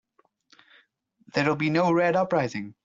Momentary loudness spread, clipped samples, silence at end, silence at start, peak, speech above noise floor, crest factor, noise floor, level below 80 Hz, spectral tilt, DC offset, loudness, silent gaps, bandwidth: 7 LU; under 0.1%; 0.15 s; 1.35 s; -10 dBFS; 41 dB; 18 dB; -65 dBFS; -66 dBFS; -6.5 dB/octave; under 0.1%; -24 LUFS; none; 7.6 kHz